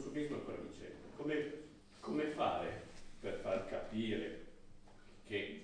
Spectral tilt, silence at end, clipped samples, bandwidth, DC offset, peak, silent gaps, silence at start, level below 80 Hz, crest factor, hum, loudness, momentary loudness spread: -6 dB/octave; 0 s; under 0.1%; 10 kHz; under 0.1%; -24 dBFS; none; 0 s; -60 dBFS; 20 dB; none; -42 LUFS; 15 LU